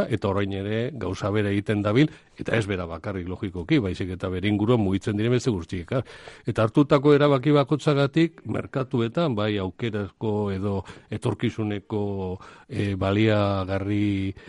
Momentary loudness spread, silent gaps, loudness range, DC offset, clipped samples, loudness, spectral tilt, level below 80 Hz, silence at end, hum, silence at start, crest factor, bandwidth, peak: 11 LU; none; 5 LU; under 0.1%; under 0.1%; -25 LUFS; -7.5 dB/octave; -52 dBFS; 0 s; none; 0 s; 18 dB; 11.5 kHz; -6 dBFS